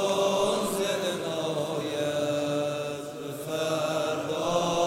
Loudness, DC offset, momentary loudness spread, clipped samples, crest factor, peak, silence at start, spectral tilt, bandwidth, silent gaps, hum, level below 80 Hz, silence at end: -28 LUFS; under 0.1%; 8 LU; under 0.1%; 16 dB; -12 dBFS; 0 s; -4 dB/octave; 16 kHz; none; none; -64 dBFS; 0 s